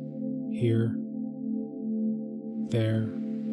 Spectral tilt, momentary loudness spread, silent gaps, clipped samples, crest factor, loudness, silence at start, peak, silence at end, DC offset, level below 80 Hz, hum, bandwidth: -9 dB/octave; 8 LU; none; under 0.1%; 14 dB; -31 LUFS; 0 s; -16 dBFS; 0 s; under 0.1%; -68 dBFS; none; 11.5 kHz